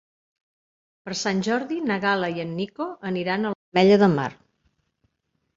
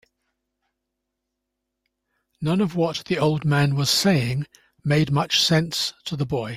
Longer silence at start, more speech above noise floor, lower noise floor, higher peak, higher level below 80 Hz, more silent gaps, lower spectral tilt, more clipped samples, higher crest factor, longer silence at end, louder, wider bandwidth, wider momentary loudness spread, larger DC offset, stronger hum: second, 1.05 s vs 2.4 s; second, 53 dB vs 59 dB; second, -75 dBFS vs -81 dBFS; about the same, -4 dBFS vs -6 dBFS; second, -64 dBFS vs -54 dBFS; first, 3.55-3.72 s vs none; about the same, -5.5 dB/octave vs -5 dB/octave; neither; about the same, 20 dB vs 18 dB; first, 1.25 s vs 0 s; about the same, -23 LUFS vs -22 LUFS; second, 7.8 kHz vs 16 kHz; about the same, 13 LU vs 11 LU; neither; neither